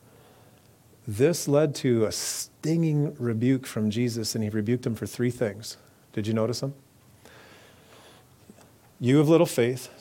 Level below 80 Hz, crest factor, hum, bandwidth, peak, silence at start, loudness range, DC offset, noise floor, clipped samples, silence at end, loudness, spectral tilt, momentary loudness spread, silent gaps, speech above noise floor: -66 dBFS; 20 dB; none; 17 kHz; -6 dBFS; 1.05 s; 8 LU; under 0.1%; -56 dBFS; under 0.1%; 0.1 s; -26 LUFS; -6 dB/octave; 12 LU; none; 31 dB